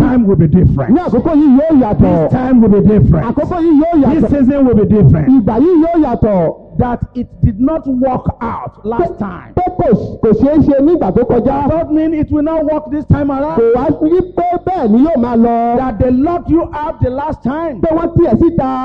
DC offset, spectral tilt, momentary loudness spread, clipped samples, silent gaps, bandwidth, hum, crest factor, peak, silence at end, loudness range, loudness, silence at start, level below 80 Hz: under 0.1%; -11.5 dB/octave; 9 LU; under 0.1%; none; 5.4 kHz; none; 10 dB; 0 dBFS; 0 s; 5 LU; -11 LUFS; 0 s; -28 dBFS